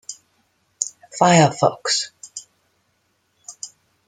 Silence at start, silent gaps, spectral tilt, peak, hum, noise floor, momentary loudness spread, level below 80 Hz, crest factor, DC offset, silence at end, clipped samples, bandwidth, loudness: 0.1 s; none; -4 dB/octave; -2 dBFS; none; -67 dBFS; 25 LU; -64 dBFS; 22 dB; under 0.1%; 0.4 s; under 0.1%; 9.6 kHz; -18 LUFS